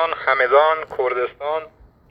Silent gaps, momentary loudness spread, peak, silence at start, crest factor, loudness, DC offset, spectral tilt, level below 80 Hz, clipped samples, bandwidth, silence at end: none; 11 LU; -2 dBFS; 0 s; 18 dB; -19 LUFS; under 0.1%; -5.5 dB/octave; -56 dBFS; under 0.1%; 5.4 kHz; 0.45 s